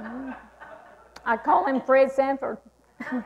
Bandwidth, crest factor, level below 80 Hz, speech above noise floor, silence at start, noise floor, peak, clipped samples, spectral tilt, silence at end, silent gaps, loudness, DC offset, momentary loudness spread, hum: 8.6 kHz; 16 dB; -62 dBFS; 27 dB; 0 s; -49 dBFS; -10 dBFS; under 0.1%; -6 dB/octave; 0 s; none; -23 LUFS; under 0.1%; 20 LU; none